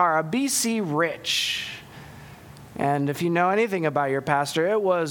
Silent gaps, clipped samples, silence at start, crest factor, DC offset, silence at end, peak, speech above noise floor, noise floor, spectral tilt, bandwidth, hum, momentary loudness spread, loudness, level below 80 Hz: none; under 0.1%; 0 s; 18 dB; under 0.1%; 0 s; -6 dBFS; 21 dB; -44 dBFS; -4 dB/octave; 19 kHz; none; 18 LU; -23 LUFS; -62 dBFS